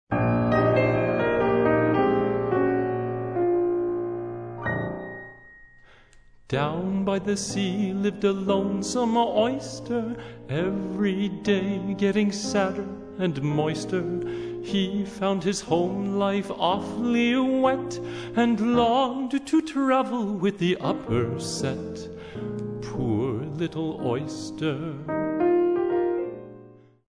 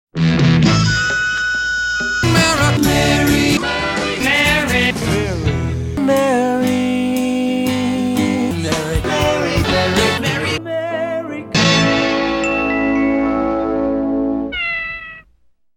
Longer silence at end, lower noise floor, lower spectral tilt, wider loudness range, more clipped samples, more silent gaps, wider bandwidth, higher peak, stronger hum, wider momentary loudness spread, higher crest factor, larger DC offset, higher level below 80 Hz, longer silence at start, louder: second, 0.35 s vs 0.55 s; about the same, -52 dBFS vs -53 dBFS; about the same, -6 dB/octave vs -5 dB/octave; first, 6 LU vs 3 LU; neither; neither; second, 10.5 kHz vs 18 kHz; second, -8 dBFS vs 0 dBFS; neither; first, 11 LU vs 7 LU; about the same, 18 dB vs 16 dB; neither; second, -52 dBFS vs -34 dBFS; about the same, 0.1 s vs 0.15 s; second, -25 LUFS vs -16 LUFS